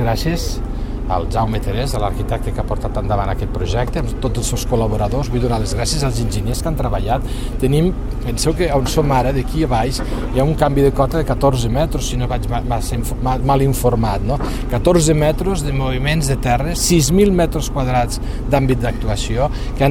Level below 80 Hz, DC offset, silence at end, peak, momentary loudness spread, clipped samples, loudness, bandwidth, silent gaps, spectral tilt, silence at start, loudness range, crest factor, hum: -22 dBFS; under 0.1%; 0 s; 0 dBFS; 7 LU; under 0.1%; -18 LUFS; 16.5 kHz; none; -5.5 dB/octave; 0 s; 4 LU; 16 dB; none